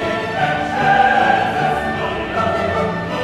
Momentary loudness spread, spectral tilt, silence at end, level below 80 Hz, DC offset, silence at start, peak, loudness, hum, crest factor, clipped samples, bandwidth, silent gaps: 8 LU; -5.5 dB/octave; 0 s; -42 dBFS; under 0.1%; 0 s; -2 dBFS; -17 LUFS; none; 14 dB; under 0.1%; 13 kHz; none